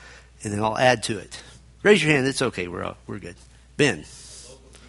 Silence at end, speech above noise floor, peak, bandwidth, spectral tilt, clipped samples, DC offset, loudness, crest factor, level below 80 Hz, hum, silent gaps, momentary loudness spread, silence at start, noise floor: 0.35 s; 23 dB; -2 dBFS; 11.5 kHz; -4.5 dB/octave; under 0.1%; under 0.1%; -22 LUFS; 22 dB; -52 dBFS; none; none; 23 LU; 0 s; -46 dBFS